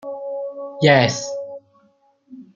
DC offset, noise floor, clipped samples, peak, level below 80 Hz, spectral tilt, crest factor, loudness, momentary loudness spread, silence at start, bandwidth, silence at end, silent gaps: under 0.1%; -59 dBFS; under 0.1%; -2 dBFS; -62 dBFS; -5 dB/octave; 20 dB; -19 LUFS; 19 LU; 0.05 s; 7.8 kHz; 0.15 s; none